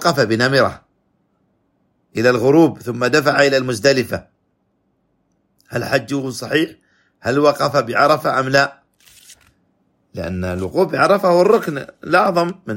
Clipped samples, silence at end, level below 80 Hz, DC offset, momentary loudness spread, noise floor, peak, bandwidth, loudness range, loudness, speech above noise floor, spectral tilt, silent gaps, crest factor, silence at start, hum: under 0.1%; 0 s; -54 dBFS; under 0.1%; 13 LU; -66 dBFS; 0 dBFS; 16.5 kHz; 5 LU; -16 LUFS; 50 dB; -5 dB/octave; none; 18 dB; 0 s; none